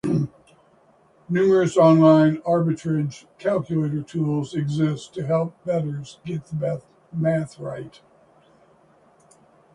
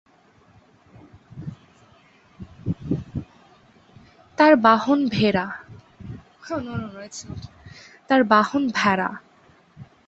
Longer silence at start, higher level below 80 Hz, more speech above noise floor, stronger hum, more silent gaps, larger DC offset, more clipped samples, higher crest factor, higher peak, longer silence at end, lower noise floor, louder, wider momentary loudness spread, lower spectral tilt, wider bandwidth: second, 0.05 s vs 1.35 s; second, -60 dBFS vs -52 dBFS; about the same, 36 dB vs 36 dB; neither; neither; neither; neither; about the same, 18 dB vs 22 dB; about the same, -4 dBFS vs -2 dBFS; first, 1.85 s vs 0.25 s; about the same, -57 dBFS vs -56 dBFS; about the same, -22 LUFS vs -20 LUFS; second, 17 LU vs 24 LU; first, -8 dB/octave vs -6 dB/octave; first, 10.5 kHz vs 8 kHz